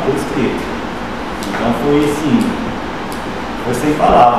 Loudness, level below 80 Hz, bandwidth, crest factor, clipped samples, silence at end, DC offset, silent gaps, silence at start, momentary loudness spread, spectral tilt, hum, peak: -16 LUFS; -34 dBFS; 15 kHz; 16 dB; under 0.1%; 0 s; 2%; none; 0 s; 9 LU; -6 dB/octave; none; 0 dBFS